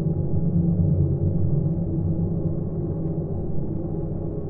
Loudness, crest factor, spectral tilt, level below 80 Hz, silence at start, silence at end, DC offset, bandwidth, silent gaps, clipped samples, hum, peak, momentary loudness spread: -25 LUFS; 14 dB; -16 dB/octave; -36 dBFS; 0 s; 0 s; under 0.1%; 1.7 kHz; none; under 0.1%; none; -10 dBFS; 7 LU